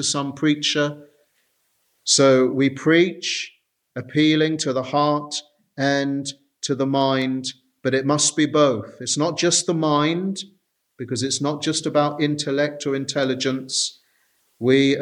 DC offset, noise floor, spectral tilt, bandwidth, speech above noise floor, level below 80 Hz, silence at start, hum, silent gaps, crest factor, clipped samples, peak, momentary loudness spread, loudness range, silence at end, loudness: under 0.1%; -68 dBFS; -4 dB/octave; 11.5 kHz; 47 dB; -68 dBFS; 0 s; none; none; 18 dB; under 0.1%; -2 dBFS; 12 LU; 4 LU; 0 s; -21 LUFS